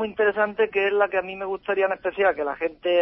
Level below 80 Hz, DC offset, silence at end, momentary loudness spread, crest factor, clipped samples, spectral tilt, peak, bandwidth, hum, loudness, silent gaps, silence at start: -60 dBFS; under 0.1%; 0 s; 6 LU; 16 dB; under 0.1%; -8.5 dB/octave; -8 dBFS; 5.8 kHz; none; -23 LUFS; none; 0 s